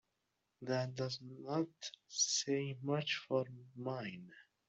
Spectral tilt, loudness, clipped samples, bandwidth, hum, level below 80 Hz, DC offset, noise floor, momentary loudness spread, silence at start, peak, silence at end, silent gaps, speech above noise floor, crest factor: -3.5 dB/octave; -39 LUFS; under 0.1%; 8.2 kHz; none; -82 dBFS; under 0.1%; -85 dBFS; 14 LU; 0.6 s; -22 dBFS; 0.25 s; none; 45 dB; 18 dB